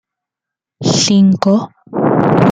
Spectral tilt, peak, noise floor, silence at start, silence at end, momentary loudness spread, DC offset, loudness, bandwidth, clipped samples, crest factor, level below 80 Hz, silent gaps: -5.5 dB/octave; 0 dBFS; -84 dBFS; 0.8 s; 0 s; 9 LU; under 0.1%; -12 LUFS; 9.2 kHz; under 0.1%; 14 dB; -48 dBFS; none